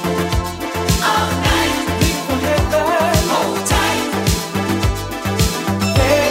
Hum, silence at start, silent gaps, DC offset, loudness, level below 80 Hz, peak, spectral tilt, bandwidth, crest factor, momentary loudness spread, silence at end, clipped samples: none; 0 s; none; under 0.1%; -17 LUFS; -26 dBFS; -2 dBFS; -4.5 dB/octave; 16.5 kHz; 16 dB; 5 LU; 0 s; under 0.1%